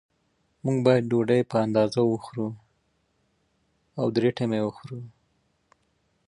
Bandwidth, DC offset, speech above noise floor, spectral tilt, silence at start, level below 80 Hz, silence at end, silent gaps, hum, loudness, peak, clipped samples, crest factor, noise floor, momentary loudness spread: 11 kHz; under 0.1%; 47 dB; -7.5 dB/octave; 0.65 s; -66 dBFS; 1.2 s; none; none; -25 LUFS; -6 dBFS; under 0.1%; 20 dB; -71 dBFS; 15 LU